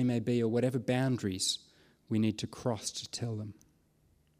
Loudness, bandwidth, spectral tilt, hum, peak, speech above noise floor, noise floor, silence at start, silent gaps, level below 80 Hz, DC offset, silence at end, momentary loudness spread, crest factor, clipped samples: -33 LUFS; 15.5 kHz; -5 dB/octave; none; -18 dBFS; 37 dB; -69 dBFS; 0 s; none; -68 dBFS; under 0.1%; 0.9 s; 8 LU; 16 dB; under 0.1%